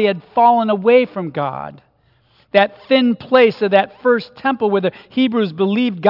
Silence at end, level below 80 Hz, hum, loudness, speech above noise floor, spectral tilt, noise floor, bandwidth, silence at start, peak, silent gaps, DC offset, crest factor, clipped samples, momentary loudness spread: 0 s; -64 dBFS; none; -16 LUFS; 42 dB; -8.5 dB/octave; -57 dBFS; 5.8 kHz; 0 s; 0 dBFS; none; under 0.1%; 16 dB; under 0.1%; 9 LU